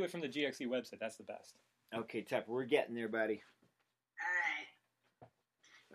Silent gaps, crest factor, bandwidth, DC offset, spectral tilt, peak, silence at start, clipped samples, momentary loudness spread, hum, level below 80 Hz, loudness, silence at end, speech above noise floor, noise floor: none; 22 dB; 15 kHz; under 0.1%; -4.5 dB/octave; -18 dBFS; 0 s; under 0.1%; 15 LU; none; under -90 dBFS; -39 LUFS; 0 s; 43 dB; -83 dBFS